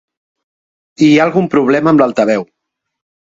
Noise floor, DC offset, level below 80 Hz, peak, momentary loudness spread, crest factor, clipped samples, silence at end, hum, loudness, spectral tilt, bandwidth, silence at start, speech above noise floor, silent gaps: under -90 dBFS; under 0.1%; -56 dBFS; 0 dBFS; 5 LU; 14 dB; under 0.1%; 0.9 s; none; -11 LUFS; -6.5 dB/octave; 7.8 kHz; 1 s; over 80 dB; none